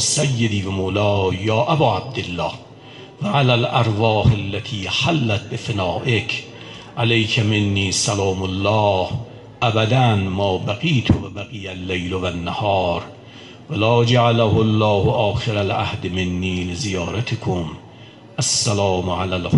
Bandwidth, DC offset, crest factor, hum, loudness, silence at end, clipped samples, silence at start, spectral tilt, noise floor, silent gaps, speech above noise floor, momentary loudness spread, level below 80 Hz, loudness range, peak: 11.5 kHz; under 0.1%; 16 dB; none; -19 LUFS; 0 s; under 0.1%; 0 s; -5 dB/octave; -42 dBFS; none; 23 dB; 12 LU; -38 dBFS; 4 LU; -4 dBFS